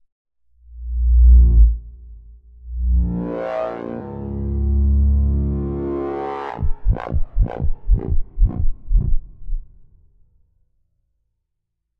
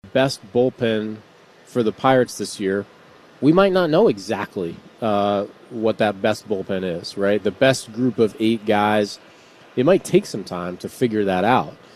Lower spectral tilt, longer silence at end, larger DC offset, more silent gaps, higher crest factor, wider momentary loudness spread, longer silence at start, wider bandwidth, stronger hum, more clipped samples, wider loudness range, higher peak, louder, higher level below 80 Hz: first, -11.5 dB/octave vs -5.5 dB/octave; first, 2.35 s vs 0.2 s; neither; neither; about the same, 16 dB vs 20 dB; first, 15 LU vs 12 LU; first, 0.7 s vs 0.05 s; second, 3.1 kHz vs 14 kHz; neither; neither; first, 9 LU vs 2 LU; about the same, -2 dBFS vs -2 dBFS; about the same, -21 LUFS vs -20 LUFS; first, -18 dBFS vs -58 dBFS